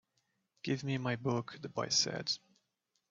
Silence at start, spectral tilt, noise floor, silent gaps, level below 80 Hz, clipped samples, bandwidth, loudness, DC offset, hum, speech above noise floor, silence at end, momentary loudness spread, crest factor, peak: 0.65 s; -3.5 dB/octave; -83 dBFS; none; -76 dBFS; under 0.1%; 7.6 kHz; -35 LUFS; under 0.1%; none; 47 dB; 0.75 s; 9 LU; 20 dB; -18 dBFS